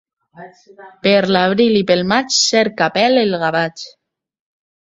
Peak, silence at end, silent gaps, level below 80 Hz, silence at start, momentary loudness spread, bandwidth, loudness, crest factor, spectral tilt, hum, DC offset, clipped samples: 0 dBFS; 1 s; none; -56 dBFS; 0.35 s; 7 LU; 8 kHz; -14 LUFS; 16 dB; -3.5 dB/octave; none; under 0.1%; under 0.1%